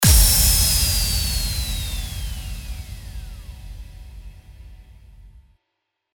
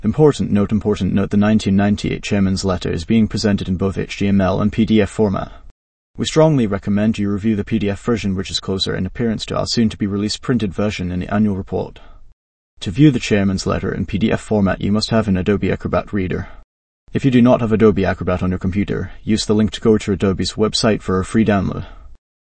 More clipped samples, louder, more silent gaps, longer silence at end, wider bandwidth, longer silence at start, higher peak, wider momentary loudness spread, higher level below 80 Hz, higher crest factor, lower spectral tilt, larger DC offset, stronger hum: neither; about the same, -18 LUFS vs -17 LUFS; second, none vs 5.71-6.14 s, 12.33-12.77 s, 16.64-17.07 s; first, 0.9 s vs 0.45 s; first, over 20 kHz vs 8.8 kHz; about the same, 0 s vs 0 s; about the same, -2 dBFS vs 0 dBFS; first, 26 LU vs 8 LU; first, -26 dBFS vs -38 dBFS; about the same, 20 dB vs 16 dB; second, -2 dB/octave vs -6.5 dB/octave; neither; neither